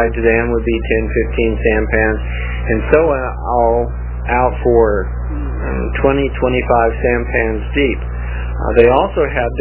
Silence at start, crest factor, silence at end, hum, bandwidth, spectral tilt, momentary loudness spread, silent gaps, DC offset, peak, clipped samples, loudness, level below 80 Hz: 0 s; 14 dB; 0 s; 60 Hz at -20 dBFS; 4 kHz; -11 dB/octave; 9 LU; none; under 0.1%; 0 dBFS; under 0.1%; -15 LUFS; -22 dBFS